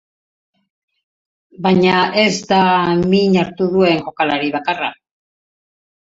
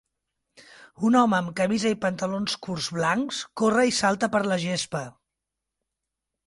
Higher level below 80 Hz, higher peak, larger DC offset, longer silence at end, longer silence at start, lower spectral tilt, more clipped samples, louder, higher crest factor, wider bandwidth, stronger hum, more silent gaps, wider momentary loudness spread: first, -52 dBFS vs -64 dBFS; first, 0 dBFS vs -8 dBFS; neither; second, 1.15 s vs 1.4 s; first, 1.6 s vs 0.8 s; about the same, -5.5 dB/octave vs -4.5 dB/octave; neither; first, -15 LUFS vs -24 LUFS; about the same, 16 dB vs 18 dB; second, 7.8 kHz vs 11.5 kHz; neither; neither; about the same, 7 LU vs 9 LU